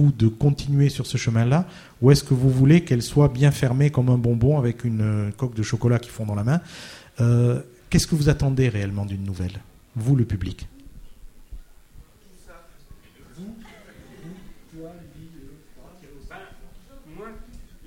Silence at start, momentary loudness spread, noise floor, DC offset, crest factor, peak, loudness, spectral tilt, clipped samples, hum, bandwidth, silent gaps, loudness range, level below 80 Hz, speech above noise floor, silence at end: 0 s; 24 LU; -48 dBFS; under 0.1%; 20 dB; -2 dBFS; -21 LUFS; -7 dB/octave; under 0.1%; none; 15 kHz; none; 11 LU; -42 dBFS; 28 dB; 0.25 s